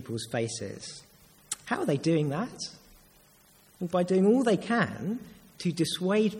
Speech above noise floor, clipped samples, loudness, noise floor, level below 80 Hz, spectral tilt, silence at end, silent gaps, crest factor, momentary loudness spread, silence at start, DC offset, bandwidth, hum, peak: 32 dB; under 0.1%; -29 LUFS; -60 dBFS; -66 dBFS; -5.5 dB/octave; 0 s; none; 18 dB; 15 LU; 0 s; under 0.1%; 16.5 kHz; none; -12 dBFS